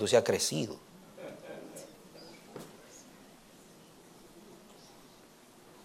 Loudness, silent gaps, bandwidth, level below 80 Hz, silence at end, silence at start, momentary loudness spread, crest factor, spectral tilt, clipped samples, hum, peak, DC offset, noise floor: -33 LUFS; none; 16.5 kHz; -74 dBFS; 1 s; 0 s; 26 LU; 26 dB; -3.5 dB/octave; under 0.1%; none; -12 dBFS; under 0.1%; -57 dBFS